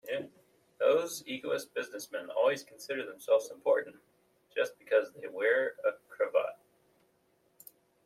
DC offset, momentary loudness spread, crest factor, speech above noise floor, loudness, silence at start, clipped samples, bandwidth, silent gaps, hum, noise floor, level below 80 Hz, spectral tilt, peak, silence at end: under 0.1%; 11 LU; 18 dB; 39 dB; -32 LUFS; 0.05 s; under 0.1%; 15 kHz; none; none; -72 dBFS; -84 dBFS; -3 dB/octave; -14 dBFS; 1.5 s